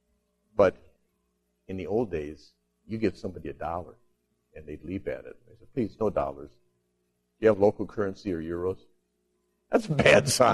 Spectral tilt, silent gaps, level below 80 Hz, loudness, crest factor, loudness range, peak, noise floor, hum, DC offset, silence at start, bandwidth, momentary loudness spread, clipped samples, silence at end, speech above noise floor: -5 dB/octave; none; -54 dBFS; -27 LUFS; 26 dB; 9 LU; -4 dBFS; -75 dBFS; 60 Hz at -60 dBFS; under 0.1%; 0.55 s; 13 kHz; 19 LU; under 0.1%; 0 s; 49 dB